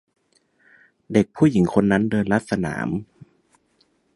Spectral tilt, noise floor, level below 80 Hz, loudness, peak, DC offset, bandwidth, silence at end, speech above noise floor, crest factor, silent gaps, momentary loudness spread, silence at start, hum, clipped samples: -7.5 dB/octave; -64 dBFS; -50 dBFS; -21 LUFS; -2 dBFS; under 0.1%; 11.5 kHz; 1.1 s; 45 dB; 20 dB; none; 9 LU; 1.1 s; none; under 0.1%